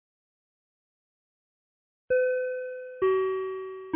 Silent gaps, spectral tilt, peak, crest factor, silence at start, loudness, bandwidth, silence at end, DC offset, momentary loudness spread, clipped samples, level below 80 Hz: none; -8.5 dB/octave; -16 dBFS; 16 dB; 2.1 s; -29 LUFS; 3.6 kHz; 0 s; under 0.1%; 11 LU; under 0.1%; -70 dBFS